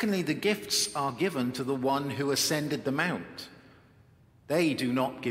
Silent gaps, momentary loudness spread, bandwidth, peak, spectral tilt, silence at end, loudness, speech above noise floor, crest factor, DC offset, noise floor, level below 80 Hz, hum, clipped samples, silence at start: none; 5 LU; 16 kHz; -12 dBFS; -4 dB/octave; 0 s; -29 LUFS; 30 dB; 18 dB; under 0.1%; -59 dBFS; -68 dBFS; none; under 0.1%; 0 s